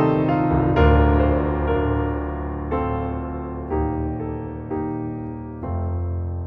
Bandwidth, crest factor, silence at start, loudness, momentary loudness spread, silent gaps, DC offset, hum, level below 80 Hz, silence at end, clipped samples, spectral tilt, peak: 4.6 kHz; 18 dB; 0 s; -23 LUFS; 13 LU; none; under 0.1%; none; -28 dBFS; 0 s; under 0.1%; -11 dB/octave; -4 dBFS